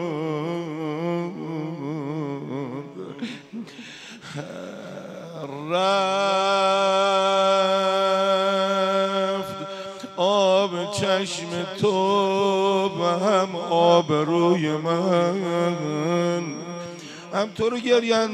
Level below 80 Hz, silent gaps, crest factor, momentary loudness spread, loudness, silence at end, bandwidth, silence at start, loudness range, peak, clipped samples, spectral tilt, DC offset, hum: -70 dBFS; none; 20 dB; 16 LU; -22 LUFS; 0 s; 12.5 kHz; 0 s; 12 LU; -4 dBFS; under 0.1%; -5 dB/octave; under 0.1%; none